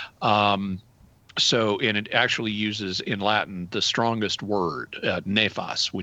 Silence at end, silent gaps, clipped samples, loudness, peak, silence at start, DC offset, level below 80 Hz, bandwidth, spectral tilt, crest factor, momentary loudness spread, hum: 0 s; none; under 0.1%; -24 LUFS; -4 dBFS; 0 s; under 0.1%; -62 dBFS; 8.4 kHz; -3.5 dB/octave; 20 dB; 8 LU; none